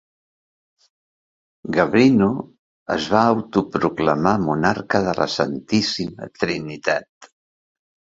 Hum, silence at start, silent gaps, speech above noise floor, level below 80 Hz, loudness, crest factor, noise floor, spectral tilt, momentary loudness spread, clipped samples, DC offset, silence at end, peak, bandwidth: none; 1.65 s; 2.59-2.86 s, 7.09-7.21 s; over 71 dB; -52 dBFS; -20 LUFS; 20 dB; under -90 dBFS; -5.5 dB/octave; 11 LU; under 0.1%; under 0.1%; 0.85 s; 0 dBFS; 7.8 kHz